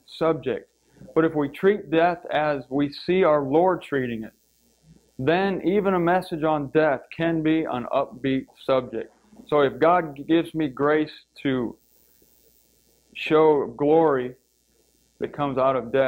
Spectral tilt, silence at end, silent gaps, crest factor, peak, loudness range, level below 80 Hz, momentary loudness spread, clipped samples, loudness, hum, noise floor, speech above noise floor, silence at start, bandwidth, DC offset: -7.5 dB/octave; 0 s; none; 16 dB; -6 dBFS; 2 LU; -58 dBFS; 11 LU; under 0.1%; -23 LUFS; none; -65 dBFS; 42 dB; 0.1 s; 16 kHz; under 0.1%